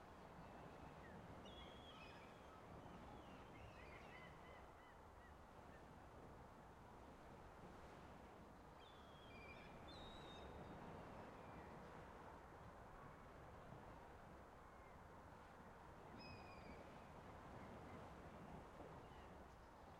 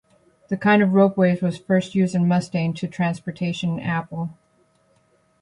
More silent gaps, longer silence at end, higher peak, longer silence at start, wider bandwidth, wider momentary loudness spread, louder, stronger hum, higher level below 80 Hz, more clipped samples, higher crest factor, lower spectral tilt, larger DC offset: neither; second, 0 s vs 1.1 s; second, -46 dBFS vs -4 dBFS; second, 0 s vs 0.5 s; first, 13.5 kHz vs 10.5 kHz; second, 5 LU vs 10 LU; second, -61 LUFS vs -21 LUFS; neither; second, -70 dBFS vs -60 dBFS; neither; about the same, 14 dB vs 18 dB; second, -5.5 dB/octave vs -7.5 dB/octave; neither